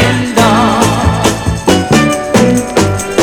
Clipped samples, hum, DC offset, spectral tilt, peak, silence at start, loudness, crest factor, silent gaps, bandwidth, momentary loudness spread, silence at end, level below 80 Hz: 0.7%; none; under 0.1%; -5 dB/octave; 0 dBFS; 0 s; -10 LUFS; 10 dB; none; over 20 kHz; 4 LU; 0 s; -26 dBFS